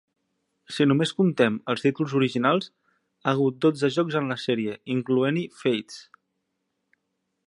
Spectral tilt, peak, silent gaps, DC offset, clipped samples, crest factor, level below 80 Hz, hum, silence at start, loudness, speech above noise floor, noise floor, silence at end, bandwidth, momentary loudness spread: -6.5 dB/octave; -6 dBFS; none; under 0.1%; under 0.1%; 20 dB; -72 dBFS; none; 0.7 s; -24 LUFS; 54 dB; -78 dBFS; 1.45 s; 11.5 kHz; 8 LU